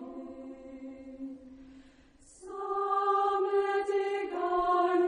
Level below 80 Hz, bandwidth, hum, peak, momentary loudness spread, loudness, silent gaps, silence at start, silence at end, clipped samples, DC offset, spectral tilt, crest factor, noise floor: -64 dBFS; 10 kHz; none; -16 dBFS; 19 LU; -30 LUFS; none; 0 s; 0 s; under 0.1%; under 0.1%; -4.5 dB/octave; 16 dB; -58 dBFS